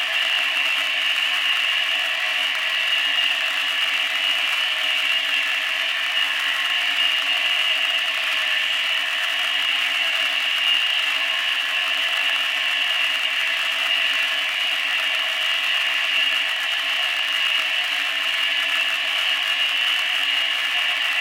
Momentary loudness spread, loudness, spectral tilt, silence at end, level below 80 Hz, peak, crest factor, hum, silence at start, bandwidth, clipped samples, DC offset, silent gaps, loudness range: 2 LU; -19 LUFS; 3 dB/octave; 0 s; -78 dBFS; -6 dBFS; 16 dB; none; 0 s; 17 kHz; under 0.1%; under 0.1%; none; 0 LU